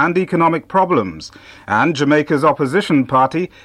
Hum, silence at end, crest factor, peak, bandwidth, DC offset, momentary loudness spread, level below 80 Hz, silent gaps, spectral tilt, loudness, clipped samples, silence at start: none; 0.15 s; 14 dB; -2 dBFS; 12.5 kHz; under 0.1%; 6 LU; -52 dBFS; none; -6.5 dB/octave; -15 LUFS; under 0.1%; 0 s